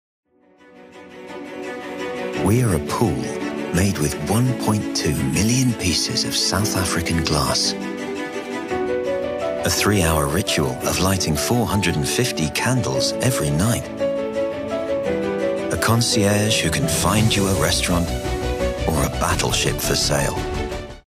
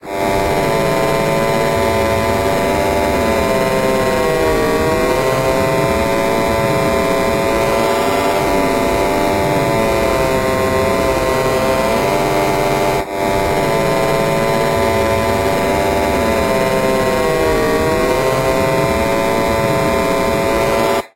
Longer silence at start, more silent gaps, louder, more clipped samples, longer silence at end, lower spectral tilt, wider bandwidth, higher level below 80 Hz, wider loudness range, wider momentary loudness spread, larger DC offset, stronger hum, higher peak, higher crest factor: first, 0.75 s vs 0.05 s; neither; second, -20 LUFS vs -15 LUFS; neither; about the same, 0.1 s vs 0.1 s; about the same, -4 dB/octave vs -5 dB/octave; about the same, 15.5 kHz vs 16 kHz; second, -36 dBFS vs -30 dBFS; first, 3 LU vs 0 LU; first, 9 LU vs 1 LU; neither; neither; about the same, -4 dBFS vs -4 dBFS; first, 18 dB vs 12 dB